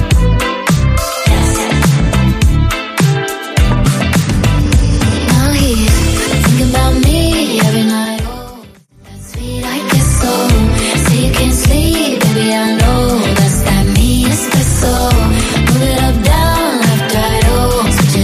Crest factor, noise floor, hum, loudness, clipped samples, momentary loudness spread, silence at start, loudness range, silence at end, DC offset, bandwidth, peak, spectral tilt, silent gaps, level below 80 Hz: 10 dB; -38 dBFS; none; -12 LUFS; under 0.1%; 3 LU; 0 s; 3 LU; 0 s; under 0.1%; 15.5 kHz; 0 dBFS; -5 dB/octave; none; -16 dBFS